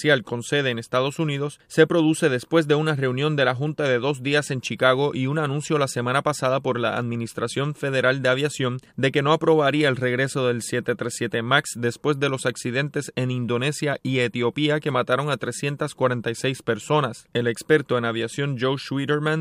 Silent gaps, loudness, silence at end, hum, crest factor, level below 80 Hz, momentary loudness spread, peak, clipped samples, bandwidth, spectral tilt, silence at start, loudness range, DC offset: none; -23 LUFS; 0 s; none; 20 dB; -66 dBFS; 7 LU; -2 dBFS; under 0.1%; 15.5 kHz; -5 dB/octave; 0 s; 3 LU; under 0.1%